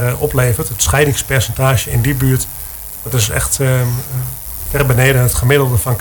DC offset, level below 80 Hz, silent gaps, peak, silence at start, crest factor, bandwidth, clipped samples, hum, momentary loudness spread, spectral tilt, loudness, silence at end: under 0.1%; -28 dBFS; none; 0 dBFS; 0 s; 14 dB; 20 kHz; 0.1%; none; 10 LU; -4.5 dB/octave; -14 LUFS; 0 s